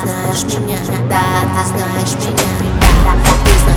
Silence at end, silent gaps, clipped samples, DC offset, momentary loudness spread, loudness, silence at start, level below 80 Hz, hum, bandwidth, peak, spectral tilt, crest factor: 0 s; none; under 0.1%; under 0.1%; 6 LU; -14 LUFS; 0 s; -16 dBFS; none; 19 kHz; 0 dBFS; -4.5 dB/octave; 12 dB